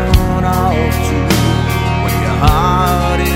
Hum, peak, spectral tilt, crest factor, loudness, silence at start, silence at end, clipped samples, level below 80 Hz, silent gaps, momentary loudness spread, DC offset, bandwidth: none; 0 dBFS; -6 dB/octave; 12 dB; -13 LUFS; 0 s; 0 s; under 0.1%; -18 dBFS; none; 3 LU; under 0.1%; 16.5 kHz